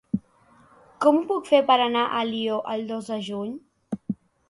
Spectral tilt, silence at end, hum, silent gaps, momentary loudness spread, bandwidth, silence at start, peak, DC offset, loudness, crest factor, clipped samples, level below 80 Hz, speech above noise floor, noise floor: -5.5 dB/octave; 0.35 s; none; none; 15 LU; 11.5 kHz; 0.15 s; -6 dBFS; under 0.1%; -24 LUFS; 20 dB; under 0.1%; -66 dBFS; 34 dB; -57 dBFS